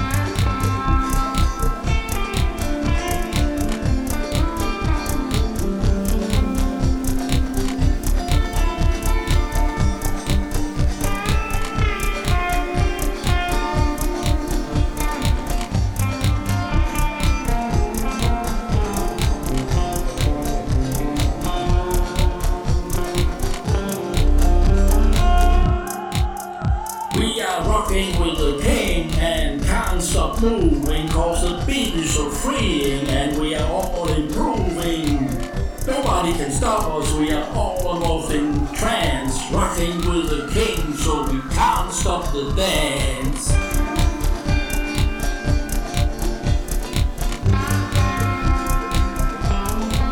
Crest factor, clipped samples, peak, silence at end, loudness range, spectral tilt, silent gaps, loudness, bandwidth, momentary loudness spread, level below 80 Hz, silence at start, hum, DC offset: 14 dB; under 0.1%; -4 dBFS; 0 s; 2 LU; -5 dB/octave; none; -21 LUFS; 18 kHz; 4 LU; -22 dBFS; 0 s; none; under 0.1%